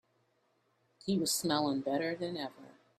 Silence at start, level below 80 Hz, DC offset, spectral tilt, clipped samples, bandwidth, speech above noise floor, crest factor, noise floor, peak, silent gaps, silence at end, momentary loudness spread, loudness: 1.05 s; -76 dBFS; under 0.1%; -4 dB/octave; under 0.1%; 15.5 kHz; 41 dB; 20 dB; -75 dBFS; -16 dBFS; none; 0.3 s; 12 LU; -34 LUFS